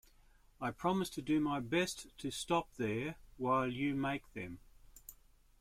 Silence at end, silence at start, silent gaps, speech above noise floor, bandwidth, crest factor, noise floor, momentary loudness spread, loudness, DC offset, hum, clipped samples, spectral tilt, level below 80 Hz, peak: 0.45 s; 0.6 s; none; 28 dB; 16 kHz; 18 dB; -65 dBFS; 17 LU; -37 LUFS; under 0.1%; none; under 0.1%; -5 dB/octave; -62 dBFS; -20 dBFS